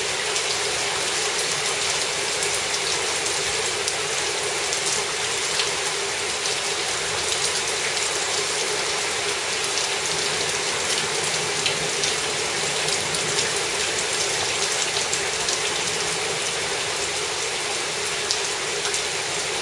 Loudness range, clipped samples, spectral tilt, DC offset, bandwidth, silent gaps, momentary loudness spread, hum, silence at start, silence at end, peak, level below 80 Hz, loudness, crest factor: 1 LU; under 0.1%; 0 dB/octave; under 0.1%; 11.5 kHz; none; 2 LU; none; 0 s; 0 s; -2 dBFS; -56 dBFS; -22 LUFS; 24 dB